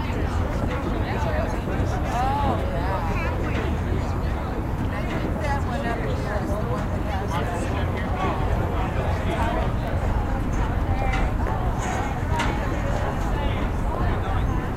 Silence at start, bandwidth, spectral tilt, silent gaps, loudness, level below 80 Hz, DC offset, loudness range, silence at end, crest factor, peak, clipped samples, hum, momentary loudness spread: 0 s; 15.5 kHz; -7 dB/octave; none; -25 LUFS; -28 dBFS; under 0.1%; 1 LU; 0 s; 14 dB; -10 dBFS; under 0.1%; none; 2 LU